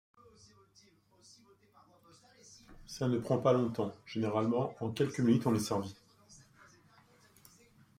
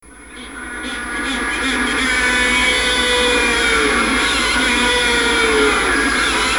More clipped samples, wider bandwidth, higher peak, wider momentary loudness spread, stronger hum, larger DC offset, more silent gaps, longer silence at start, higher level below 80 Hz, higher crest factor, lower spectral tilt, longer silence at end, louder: neither; second, 16 kHz vs over 20 kHz; second, -16 dBFS vs -4 dBFS; first, 19 LU vs 11 LU; neither; second, under 0.1% vs 0.2%; neither; first, 2.7 s vs 0.05 s; second, -68 dBFS vs -34 dBFS; first, 20 dB vs 14 dB; first, -6.5 dB/octave vs -2 dB/octave; first, 1.65 s vs 0 s; second, -33 LUFS vs -14 LUFS